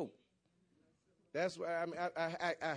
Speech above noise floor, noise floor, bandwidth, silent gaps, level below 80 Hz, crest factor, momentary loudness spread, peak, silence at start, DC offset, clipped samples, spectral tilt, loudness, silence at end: 38 dB; -77 dBFS; 10.5 kHz; none; -84 dBFS; 18 dB; 5 LU; -24 dBFS; 0 s; under 0.1%; under 0.1%; -5 dB/octave; -40 LUFS; 0 s